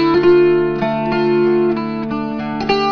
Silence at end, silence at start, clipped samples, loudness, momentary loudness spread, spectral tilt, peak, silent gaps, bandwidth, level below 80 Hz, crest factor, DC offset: 0 s; 0 s; under 0.1%; -16 LUFS; 10 LU; -7.5 dB/octave; -2 dBFS; none; 5.4 kHz; -44 dBFS; 14 dB; under 0.1%